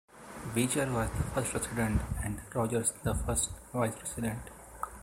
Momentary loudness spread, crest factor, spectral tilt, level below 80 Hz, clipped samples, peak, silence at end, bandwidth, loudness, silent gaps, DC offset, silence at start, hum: 12 LU; 20 dB; -4.5 dB/octave; -44 dBFS; under 0.1%; -14 dBFS; 0 s; 16 kHz; -33 LUFS; none; under 0.1%; 0.15 s; none